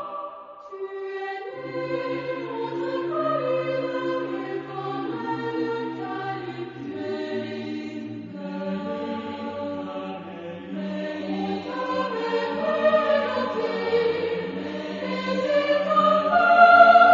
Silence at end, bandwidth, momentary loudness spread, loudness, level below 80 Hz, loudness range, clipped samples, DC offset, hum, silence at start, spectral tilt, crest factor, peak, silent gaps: 0 s; 7.4 kHz; 15 LU; -24 LUFS; -70 dBFS; 8 LU; under 0.1%; under 0.1%; none; 0 s; -6.5 dB/octave; 22 dB; -2 dBFS; none